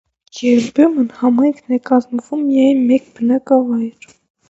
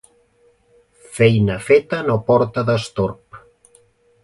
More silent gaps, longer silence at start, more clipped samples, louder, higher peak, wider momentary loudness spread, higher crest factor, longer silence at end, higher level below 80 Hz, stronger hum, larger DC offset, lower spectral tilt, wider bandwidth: neither; second, 0.35 s vs 1.1 s; neither; about the same, -15 LUFS vs -17 LUFS; about the same, 0 dBFS vs -2 dBFS; about the same, 8 LU vs 9 LU; about the same, 14 dB vs 18 dB; second, 0.6 s vs 0.85 s; second, -62 dBFS vs -48 dBFS; neither; neither; about the same, -6 dB/octave vs -6.5 dB/octave; second, 7.8 kHz vs 11.5 kHz